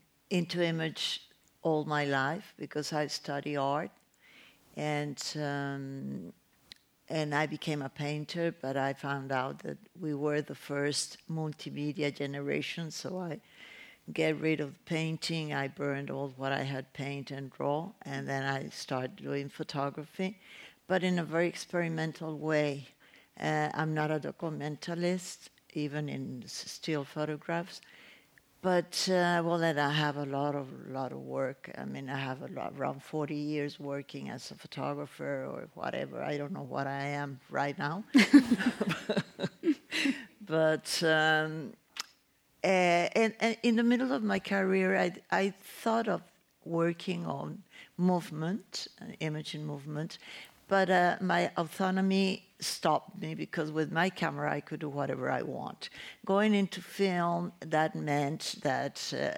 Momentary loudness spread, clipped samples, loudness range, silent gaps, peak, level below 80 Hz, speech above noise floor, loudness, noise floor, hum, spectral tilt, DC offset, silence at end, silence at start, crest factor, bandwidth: 12 LU; under 0.1%; 8 LU; none; -8 dBFS; -76 dBFS; 37 dB; -33 LUFS; -69 dBFS; none; -5 dB/octave; under 0.1%; 0 s; 0.3 s; 24 dB; 17 kHz